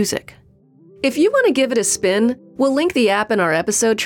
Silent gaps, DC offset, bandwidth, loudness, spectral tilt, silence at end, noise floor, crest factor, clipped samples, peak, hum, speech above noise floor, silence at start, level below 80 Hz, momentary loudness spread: none; under 0.1%; 18.5 kHz; -17 LUFS; -3 dB/octave; 0 s; -50 dBFS; 12 dB; under 0.1%; -6 dBFS; none; 33 dB; 0 s; -58 dBFS; 6 LU